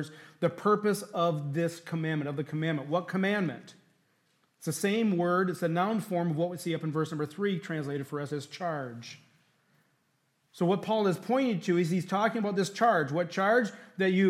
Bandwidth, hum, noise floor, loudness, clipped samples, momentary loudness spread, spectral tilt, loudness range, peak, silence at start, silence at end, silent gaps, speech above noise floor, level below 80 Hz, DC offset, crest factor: 15.5 kHz; none; -73 dBFS; -30 LUFS; under 0.1%; 9 LU; -6 dB/octave; 7 LU; -12 dBFS; 0 s; 0 s; none; 44 dB; -82 dBFS; under 0.1%; 18 dB